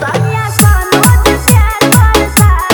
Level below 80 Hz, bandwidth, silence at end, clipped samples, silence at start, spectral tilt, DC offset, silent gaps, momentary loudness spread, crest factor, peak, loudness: -14 dBFS; over 20 kHz; 0 s; 1%; 0 s; -4.5 dB/octave; under 0.1%; none; 4 LU; 8 dB; 0 dBFS; -8 LUFS